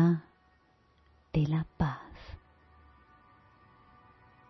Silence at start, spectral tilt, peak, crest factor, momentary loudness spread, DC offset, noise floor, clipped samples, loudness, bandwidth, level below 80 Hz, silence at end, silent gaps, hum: 0 s; -9.5 dB/octave; -14 dBFS; 20 dB; 21 LU; under 0.1%; -66 dBFS; under 0.1%; -32 LUFS; 6 kHz; -52 dBFS; 2.15 s; none; none